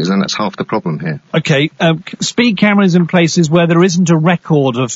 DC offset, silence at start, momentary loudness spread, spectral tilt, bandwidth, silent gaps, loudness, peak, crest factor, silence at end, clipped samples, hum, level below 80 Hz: under 0.1%; 0 s; 7 LU; -5.5 dB/octave; 8 kHz; none; -12 LUFS; 0 dBFS; 12 dB; 0 s; under 0.1%; none; -56 dBFS